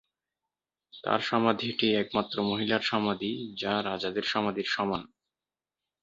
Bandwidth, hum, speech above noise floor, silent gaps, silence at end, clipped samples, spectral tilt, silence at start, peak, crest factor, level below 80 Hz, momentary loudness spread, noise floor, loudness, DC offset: 7.6 kHz; none; over 61 dB; none; 0.95 s; under 0.1%; -5.5 dB/octave; 0.95 s; -8 dBFS; 22 dB; -66 dBFS; 6 LU; under -90 dBFS; -29 LUFS; under 0.1%